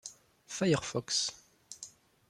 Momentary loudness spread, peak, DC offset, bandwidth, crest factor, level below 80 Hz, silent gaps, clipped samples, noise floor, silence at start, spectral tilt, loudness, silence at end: 19 LU; -14 dBFS; under 0.1%; 14.5 kHz; 22 dB; -70 dBFS; none; under 0.1%; -54 dBFS; 0.05 s; -3.5 dB/octave; -32 LUFS; 0.4 s